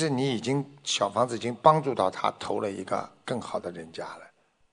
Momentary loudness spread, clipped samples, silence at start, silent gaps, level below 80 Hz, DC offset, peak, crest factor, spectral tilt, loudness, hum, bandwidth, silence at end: 17 LU; under 0.1%; 0 s; none; -70 dBFS; under 0.1%; -4 dBFS; 24 dB; -5 dB/octave; -27 LUFS; none; 10.5 kHz; 0.45 s